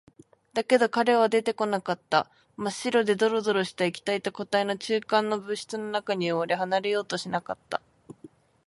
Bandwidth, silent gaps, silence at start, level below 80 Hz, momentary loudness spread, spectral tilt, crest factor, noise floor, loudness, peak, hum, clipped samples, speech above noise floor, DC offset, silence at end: 11.5 kHz; none; 0.55 s; -72 dBFS; 11 LU; -4.5 dB/octave; 20 dB; -53 dBFS; -27 LUFS; -8 dBFS; none; under 0.1%; 27 dB; under 0.1%; 0.4 s